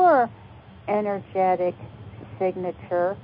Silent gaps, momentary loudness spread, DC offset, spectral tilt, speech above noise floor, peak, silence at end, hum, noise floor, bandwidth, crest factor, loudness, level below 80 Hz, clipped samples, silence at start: none; 19 LU; under 0.1%; -11.5 dB/octave; 21 dB; -8 dBFS; 0 s; none; -45 dBFS; 5.2 kHz; 16 dB; -25 LUFS; -56 dBFS; under 0.1%; 0 s